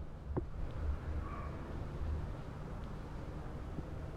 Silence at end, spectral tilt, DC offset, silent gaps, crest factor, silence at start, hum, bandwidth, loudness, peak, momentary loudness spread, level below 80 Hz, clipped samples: 0 s; -8 dB/octave; under 0.1%; none; 16 dB; 0 s; none; 9.6 kHz; -44 LUFS; -26 dBFS; 5 LU; -44 dBFS; under 0.1%